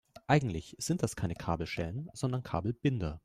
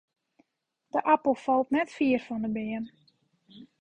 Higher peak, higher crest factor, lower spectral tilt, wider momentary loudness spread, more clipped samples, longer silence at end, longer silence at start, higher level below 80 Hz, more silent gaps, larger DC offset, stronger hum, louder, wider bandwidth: second, -14 dBFS vs -10 dBFS; about the same, 20 dB vs 20 dB; about the same, -6 dB/octave vs -6.5 dB/octave; about the same, 8 LU vs 10 LU; neither; about the same, 0.05 s vs 0.15 s; second, 0.15 s vs 0.95 s; first, -54 dBFS vs -68 dBFS; neither; neither; neither; second, -34 LUFS vs -28 LUFS; first, 15 kHz vs 9.4 kHz